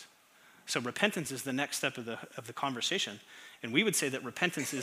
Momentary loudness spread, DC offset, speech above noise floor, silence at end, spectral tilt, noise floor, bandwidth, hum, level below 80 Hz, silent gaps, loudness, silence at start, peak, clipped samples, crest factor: 14 LU; under 0.1%; 27 dB; 0 s; -2.5 dB/octave; -62 dBFS; 16 kHz; none; -82 dBFS; none; -33 LUFS; 0 s; -10 dBFS; under 0.1%; 26 dB